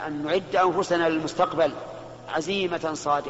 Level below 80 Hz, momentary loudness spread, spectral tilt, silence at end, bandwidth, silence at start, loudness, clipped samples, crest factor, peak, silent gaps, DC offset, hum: -58 dBFS; 10 LU; -3 dB/octave; 0 s; 8 kHz; 0 s; -25 LUFS; under 0.1%; 16 dB; -8 dBFS; none; under 0.1%; none